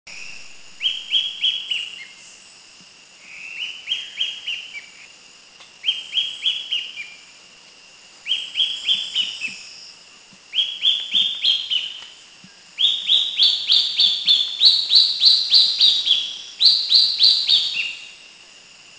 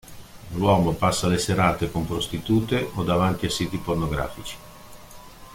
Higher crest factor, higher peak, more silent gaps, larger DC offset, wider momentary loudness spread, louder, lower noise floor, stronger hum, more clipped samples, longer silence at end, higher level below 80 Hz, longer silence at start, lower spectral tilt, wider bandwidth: about the same, 22 dB vs 18 dB; first, 0 dBFS vs -6 dBFS; neither; neither; first, 22 LU vs 14 LU; first, -16 LUFS vs -23 LUFS; first, -47 dBFS vs -43 dBFS; neither; neither; first, 0.7 s vs 0 s; second, -68 dBFS vs -42 dBFS; about the same, 0.05 s vs 0.05 s; second, 2 dB/octave vs -5.5 dB/octave; second, 8 kHz vs 16.5 kHz